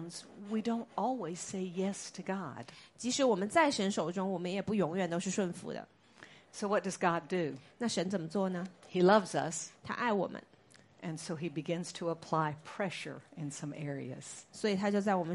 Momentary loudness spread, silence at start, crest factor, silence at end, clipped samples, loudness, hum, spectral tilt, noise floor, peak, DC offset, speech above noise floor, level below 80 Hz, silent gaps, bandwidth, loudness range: 15 LU; 0 s; 22 dB; 0 s; under 0.1%; -35 LUFS; none; -5 dB/octave; -62 dBFS; -12 dBFS; under 0.1%; 28 dB; -76 dBFS; none; 11.5 kHz; 6 LU